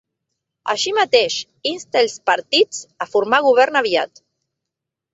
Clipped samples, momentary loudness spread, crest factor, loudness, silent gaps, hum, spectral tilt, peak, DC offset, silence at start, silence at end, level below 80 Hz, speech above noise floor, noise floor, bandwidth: under 0.1%; 10 LU; 18 dB; -17 LUFS; none; none; -1.5 dB/octave; 0 dBFS; under 0.1%; 0.65 s; 1.05 s; -68 dBFS; 65 dB; -83 dBFS; 8 kHz